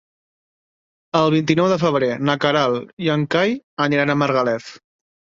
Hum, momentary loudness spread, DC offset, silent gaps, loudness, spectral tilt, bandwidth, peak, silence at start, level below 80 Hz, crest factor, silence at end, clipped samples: none; 6 LU; under 0.1%; 2.93-2.97 s, 3.64-3.77 s; -19 LUFS; -6 dB/octave; 7.6 kHz; -2 dBFS; 1.15 s; -60 dBFS; 18 dB; 0.6 s; under 0.1%